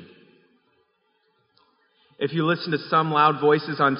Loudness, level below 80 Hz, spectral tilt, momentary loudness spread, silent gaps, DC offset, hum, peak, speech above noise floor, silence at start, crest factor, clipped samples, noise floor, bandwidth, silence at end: -22 LUFS; -74 dBFS; -4 dB/octave; 8 LU; none; under 0.1%; none; -4 dBFS; 48 dB; 0 s; 20 dB; under 0.1%; -69 dBFS; 5.4 kHz; 0 s